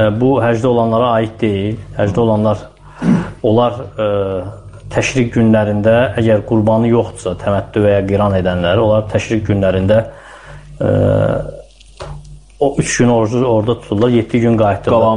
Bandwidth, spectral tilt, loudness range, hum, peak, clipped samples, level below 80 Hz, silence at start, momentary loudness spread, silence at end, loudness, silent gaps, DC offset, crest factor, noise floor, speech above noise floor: 10.5 kHz; -6.5 dB/octave; 3 LU; none; -2 dBFS; under 0.1%; -38 dBFS; 0 s; 9 LU; 0 s; -14 LUFS; none; under 0.1%; 12 dB; -35 dBFS; 22 dB